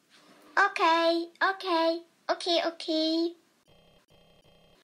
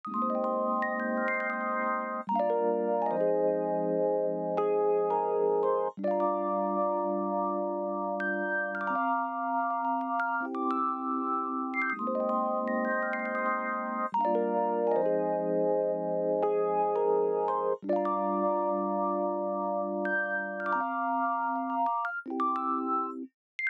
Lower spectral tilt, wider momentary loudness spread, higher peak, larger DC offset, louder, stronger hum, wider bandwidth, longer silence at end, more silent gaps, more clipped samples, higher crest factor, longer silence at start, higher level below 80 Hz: second, -1.5 dB/octave vs -9 dB/octave; first, 8 LU vs 4 LU; first, -12 dBFS vs -16 dBFS; neither; first, -27 LUFS vs -30 LUFS; neither; first, 12.5 kHz vs 5.2 kHz; first, 1.5 s vs 0 s; second, none vs 23.34-23.59 s; neither; first, 18 dB vs 12 dB; first, 0.55 s vs 0.05 s; first, -76 dBFS vs -86 dBFS